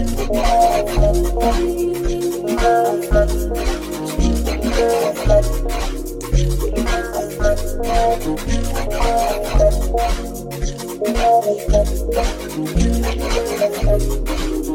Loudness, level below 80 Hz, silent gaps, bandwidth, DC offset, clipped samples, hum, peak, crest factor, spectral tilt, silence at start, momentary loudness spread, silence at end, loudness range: -19 LUFS; -20 dBFS; none; 17 kHz; under 0.1%; under 0.1%; none; -2 dBFS; 16 dB; -5.5 dB/octave; 0 s; 8 LU; 0 s; 2 LU